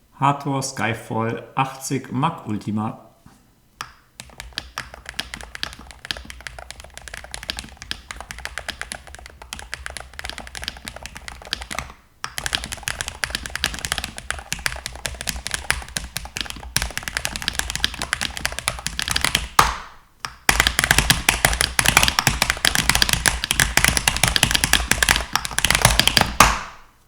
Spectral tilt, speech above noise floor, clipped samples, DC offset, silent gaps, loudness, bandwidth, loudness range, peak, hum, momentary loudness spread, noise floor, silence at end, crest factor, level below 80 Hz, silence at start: -2 dB/octave; 31 dB; under 0.1%; under 0.1%; none; -20 LUFS; over 20 kHz; 16 LU; 0 dBFS; none; 19 LU; -54 dBFS; 0.25 s; 24 dB; -34 dBFS; 0.2 s